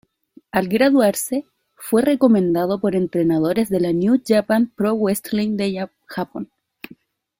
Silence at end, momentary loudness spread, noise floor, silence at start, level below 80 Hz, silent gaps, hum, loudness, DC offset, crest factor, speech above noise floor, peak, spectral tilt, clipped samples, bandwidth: 0.95 s; 14 LU; -52 dBFS; 0.55 s; -58 dBFS; none; none; -19 LUFS; under 0.1%; 16 dB; 34 dB; -4 dBFS; -6 dB/octave; under 0.1%; 16.5 kHz